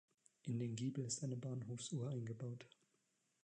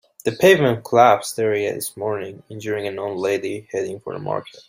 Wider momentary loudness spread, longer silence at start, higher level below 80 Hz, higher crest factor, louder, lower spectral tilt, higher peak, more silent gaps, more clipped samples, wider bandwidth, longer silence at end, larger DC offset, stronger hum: second, 10 LU vs 14 LU; first, 0.45 s vs 0.25 s; second, -86 dBFS vs -62 dBFS; about the same, 16 dB vs 18 dB; second, -46 LUFS vs -20 LUFS; about the same, -5.5 dB/octave vs -5 dB/octave; second, -30 dBFS vs -2 dBFS; neither; neither; second, 10 kHz vs 16 kHz; first, 0.75 s vs 0.2 s; neither; neither